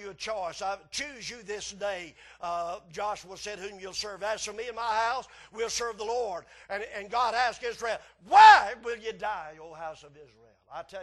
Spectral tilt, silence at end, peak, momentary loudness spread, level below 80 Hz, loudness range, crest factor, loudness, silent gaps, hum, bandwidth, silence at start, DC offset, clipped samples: -1 dB/octave; 0 s; -4 dBFS; 18 LU; -62 dBFS; 13 LU; 24 dB; -27 LUFS; none; none; 12 kHz; 0 s; under 0.1%; under 0.1%